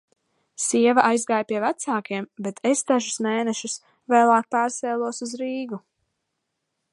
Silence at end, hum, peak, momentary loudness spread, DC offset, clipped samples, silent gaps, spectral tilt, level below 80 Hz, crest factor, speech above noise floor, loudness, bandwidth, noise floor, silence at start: 1.15 s; none; -2 dBFS; 14 LU; under 0.1%; under 0.1%; none; -3.5 dB/octave; -78 dBFS; 22 dB; 56 dB; -23 LUFS; 11.5 kHz; -79 dBFS; 0.6 s